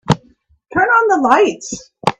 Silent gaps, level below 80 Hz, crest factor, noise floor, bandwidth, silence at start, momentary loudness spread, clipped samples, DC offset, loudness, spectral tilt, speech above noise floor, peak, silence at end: none; -50 dBFS; 16 dB; -53 dBFS; 10.5 kHz; 0.05 s; 13 LU; under 0.1%; under 0.1%; -14 LUFS; -5 dB/octave; 40 dB; 0 dBFS; 0.1 s